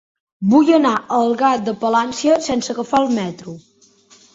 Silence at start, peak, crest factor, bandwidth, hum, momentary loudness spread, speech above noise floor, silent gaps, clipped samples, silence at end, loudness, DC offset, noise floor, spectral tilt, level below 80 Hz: 0.4 s; -2 dBFS; 16 dB; 8 kHz; none; 10 LU; 35 dB; none; under 0.1%; 0.75 s; -17 LUFS; under 0.1%; -51 dBFS; -5 dB/octave; -58 dBFS